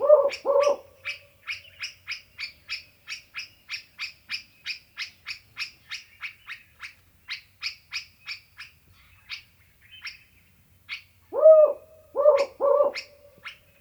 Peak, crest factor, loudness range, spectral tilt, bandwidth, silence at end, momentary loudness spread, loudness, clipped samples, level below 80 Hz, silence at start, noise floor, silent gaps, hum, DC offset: -4 dBFS; 22 dB; 16 LU; -2 dB/octave; over 20 kHz; 0.3 s; 21 LU; -25 LUFS; under 0.1%; -68 dBFS; 0 s; -59 dBFS; none; none; under 0.1%